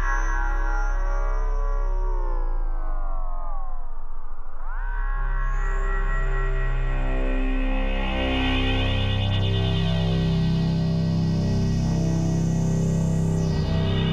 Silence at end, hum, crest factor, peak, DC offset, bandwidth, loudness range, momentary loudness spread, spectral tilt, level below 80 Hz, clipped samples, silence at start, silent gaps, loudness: 0 s; none; 12 dB; -10 dBFS; under 0.1%; 7.8 kHz; 10 LU; 11 LU; -6.5 dB/octave; -24 dBFS; under 0.1%; 0 s; none; -25 LUFS